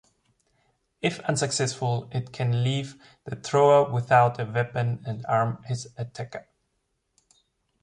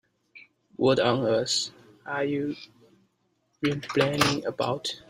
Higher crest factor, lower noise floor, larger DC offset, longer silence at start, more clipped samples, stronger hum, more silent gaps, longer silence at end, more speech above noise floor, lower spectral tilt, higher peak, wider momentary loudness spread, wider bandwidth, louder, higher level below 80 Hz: about the same, 20 dB vs 24 dB; first, -76 dBFS vs -72 dBFS; neither; first, 1.05 s vs 0.35 s; neither; neither; neither; first, 1.4 s vs 0.1 s; first, 51 dB vs 46 dB; about the same, -5 dB/octave vs -4.5 dB/octave; about the same, -6 dBFS vs -4 dBFS; first, 17 LU vs 12 LU; second, 11 kHz vs 15.5 kHz; about the same, -25 LUFS vs -26 LUFS; about the same, -62 dBFS vs -62 dBFS